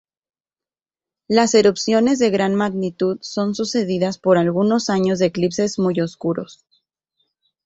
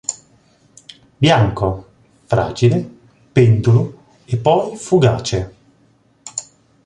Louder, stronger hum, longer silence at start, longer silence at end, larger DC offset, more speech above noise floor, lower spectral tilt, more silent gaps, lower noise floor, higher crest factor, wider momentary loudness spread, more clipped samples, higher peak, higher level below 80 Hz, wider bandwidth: about the same, -19 LUFS vs -17 LUFS; neither; first, 1.3 s vs 0.1 s; first, 1.1 s vs 0.45 s; neither; first, over 72 dB vs 41 dB; about the same, -5.5 dB/octave vs -6 dB/octave; neither; first, under -90 dBFS vs -55 dBFS; about the same, 18 dB vs 16 dB; second, 8 LU vs 16 LU; neither; about the same, -2 dBFS vs -2 dBFS; second, -60 dBFS vs -42 dBFS; second, 8 kHz vs 10 kHz